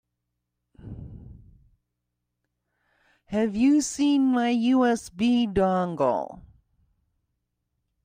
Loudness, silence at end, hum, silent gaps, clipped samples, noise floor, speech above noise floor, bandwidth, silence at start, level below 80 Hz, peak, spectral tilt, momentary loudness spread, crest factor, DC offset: -23 LUFS; 1.65 s; 60 Hz at -60 dBFS; none; under 0.1%; -81 dBFS; 59 dB; 15 kHz; 0.85 s; -54 dBFS; -10 dBFS; -5 dB/octave; 20 LU; 16 dB; under 0.1%